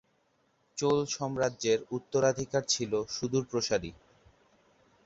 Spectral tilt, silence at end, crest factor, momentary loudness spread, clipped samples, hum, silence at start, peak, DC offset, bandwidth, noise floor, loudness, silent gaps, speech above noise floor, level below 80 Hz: -4 dB/octave; 1.15 s; 20 dB; 5 LU; under 0.1%; none; 0.75 s; -12 dBFS; under 0.1%; 8 kHz; -72 dBFS; -30 LUFS; none; 41 dB; -62 dBFS